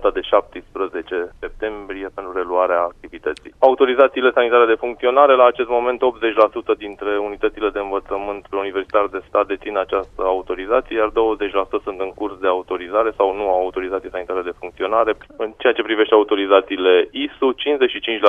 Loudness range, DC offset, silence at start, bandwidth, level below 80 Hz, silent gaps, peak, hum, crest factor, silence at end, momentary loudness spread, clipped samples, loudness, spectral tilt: 6 LU; under 0.1%; 0 s; 4.8 kHz; -46 dBFS; none; 0 dBFS; none; 18 dB; 0 s; 12 LU; under 0.1%; -19 LUFS; -5.5 dB/octave